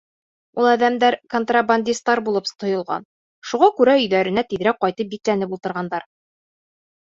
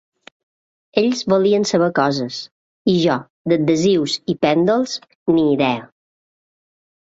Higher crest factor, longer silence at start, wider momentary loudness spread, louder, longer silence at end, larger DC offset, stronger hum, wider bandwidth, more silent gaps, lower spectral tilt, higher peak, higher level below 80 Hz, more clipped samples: about the same, 18 dB vs 18 dB; second, 0.55 s vs 0.95 s; first, 12 LU vs 9 LU; about the same, -20 LUFS vs -18 LUFS; second, 1 s vs 1.2 s; neither; neither; about the same, 7.8 kHz vs 8 kHz; second, 3.05-3.42 s vs 2.51-2.85 s, 3.30-3.45 s, 5.15-5.26 s; about the same, -4.5 dB/octave vs -5.5 dB/octave; about the same, -2 dBFS vs -2 dBFS; second, -64 dBFS vs -58 dBFS; neither